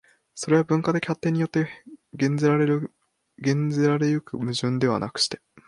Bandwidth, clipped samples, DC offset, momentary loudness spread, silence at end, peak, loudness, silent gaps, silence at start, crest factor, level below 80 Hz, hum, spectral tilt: 11.5 kHz; under 0.1%; under 0.1%; 9 LU; 0.3 s; -8 dBFS; -24 LUFS; none; 0.35 s; 16 dB; -64 dBFS; none; -6 dB/octave